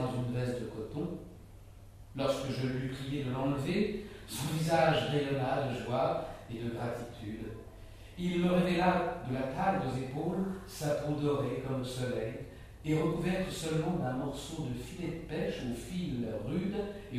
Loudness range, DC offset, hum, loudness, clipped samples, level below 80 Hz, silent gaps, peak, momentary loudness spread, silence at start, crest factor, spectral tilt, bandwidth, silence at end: 4 LU; under 0.1%; none; -34 LUFS; under 0.1%; -54 dBFS; none; -14 dBFS; 13 LU; 0 s; 20 dB; -6.5 dB/octave; 15.5 kHz; 0 s